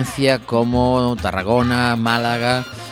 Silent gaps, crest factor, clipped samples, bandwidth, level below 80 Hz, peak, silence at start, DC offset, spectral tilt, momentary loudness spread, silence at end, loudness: none; 18 dB; under 0.1%; 16.5 kHz; -38 dBFS; 0 dBFS; 0 s; under 0.1%; -5.5 dB/octave; 3 LU; 0 s; -18 LUFS